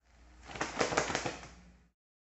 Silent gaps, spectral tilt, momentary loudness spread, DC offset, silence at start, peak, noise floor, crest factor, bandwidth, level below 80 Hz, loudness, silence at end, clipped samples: none; -3 dB/octave; 20 LU; under 0.1%; 0.2 s; -12 dBFS; -57 dBFS; 28 dB; 8.2 kHz; -58 dBFS; -35 LUFS; 0.65 s; under 0.1%